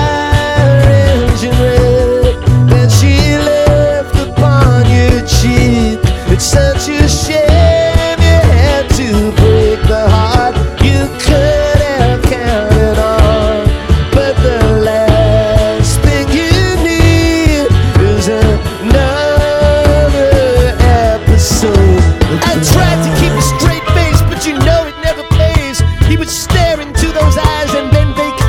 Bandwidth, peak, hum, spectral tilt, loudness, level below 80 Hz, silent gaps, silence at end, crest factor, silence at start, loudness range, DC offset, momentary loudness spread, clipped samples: 16.5 kHz; 0 dBFS; none; -5.5 dB/octave; -10 LUFS; -14 dBFS; none; 0 s; 8 dB; 0 s; 2 LU; under 0.1%; 4 LU; 1%